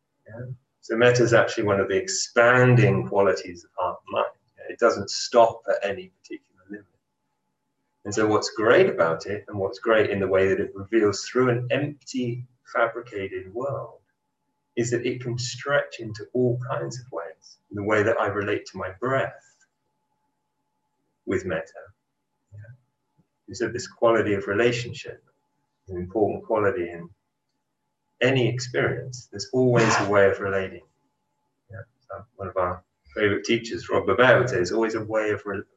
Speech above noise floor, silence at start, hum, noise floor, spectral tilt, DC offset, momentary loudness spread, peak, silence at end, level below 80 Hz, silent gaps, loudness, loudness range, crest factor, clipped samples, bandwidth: 55 dB; 0.3 s; none; -79 dBFS; -5.5 dB/octave; under 0.1%; 20 LU; -4 dBFS; 0.15 s; -56 dBFS; none; -23 LUFS; 8 LU; 20 dB; under 0.1%; 8.4 kHz